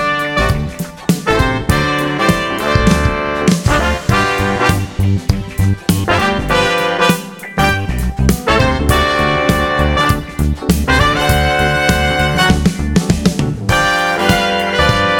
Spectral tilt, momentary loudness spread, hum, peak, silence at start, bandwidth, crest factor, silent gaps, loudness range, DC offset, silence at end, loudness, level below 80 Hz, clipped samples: -5 dB/octave; 5 LU; none; 0 dBFS; 0 s; 19 kHz; 14 dB; none; 2 LU; 0.3%; 0 s; -14 LUFS; -22 dBFS; under 0.1%